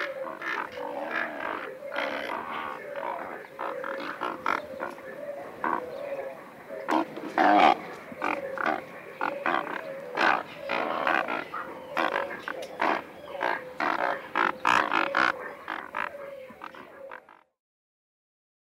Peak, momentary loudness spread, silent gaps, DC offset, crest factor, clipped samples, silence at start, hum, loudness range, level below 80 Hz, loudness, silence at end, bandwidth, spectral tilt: -6 dBFS; 16 LU; none; under 0.1%; 24 dB; under 0.1%; 0 s; none; 7 LU; -72 dBFS; -29 LUFS; 1.4 s; 16 kHz; -4 dB/octave